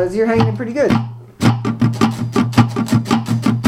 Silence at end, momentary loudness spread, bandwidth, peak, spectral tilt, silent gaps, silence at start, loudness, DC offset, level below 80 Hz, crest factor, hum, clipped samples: 0 s; 3 LU; 15.5 kHz; 0 dBFS; -7 dB/octave; none; 0 s; -16 LUFS; under 0.1%; -44 dBFS; 16 dB; none; under 0.1%